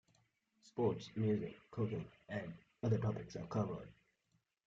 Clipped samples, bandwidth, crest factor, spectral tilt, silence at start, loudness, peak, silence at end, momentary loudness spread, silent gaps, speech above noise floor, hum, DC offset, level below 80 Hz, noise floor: under 0.1%; 7.6 kHz; 18 dB; -8 dB/octave; 0.65 s; -41 LUFS; -24 dBFS; 0.75 s; 11 LU; none; 42 dB; none; under 0.1%; -70 dBFS; -82 dBFS